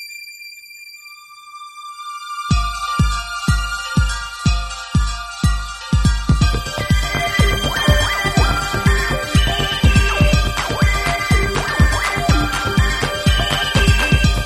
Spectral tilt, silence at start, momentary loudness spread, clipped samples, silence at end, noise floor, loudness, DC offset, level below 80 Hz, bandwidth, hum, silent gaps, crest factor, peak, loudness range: -4.5 dB/octave; 0 s; 18 LU; under 0.1%; 0 s; -39 dBFS; -17 LUFS; under 0.1%; -22 dBFS; 15.5 kHz; none; none; 16 dB; -2 dBFS; 5 LU